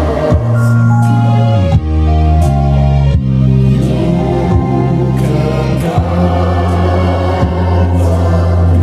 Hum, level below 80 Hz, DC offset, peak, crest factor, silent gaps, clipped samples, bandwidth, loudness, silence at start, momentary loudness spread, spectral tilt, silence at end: none; -18 dBFS; under 0.1%; 0 dBFS; 10 dB; none; under 0.1%; 11 kHz; -11 LUFS; 0 s; 3 LU; -8.5 dB/octave; 0 s